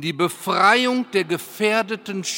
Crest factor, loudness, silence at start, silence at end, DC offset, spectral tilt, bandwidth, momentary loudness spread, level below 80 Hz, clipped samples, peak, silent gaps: 20 dB; -20 LUFS; 0 s; 0 s; under 0.1%; -3.5 dB/octave; 17 kHz; 11 LU; -74 dBFS; under 0.1%; -2 dBFS; none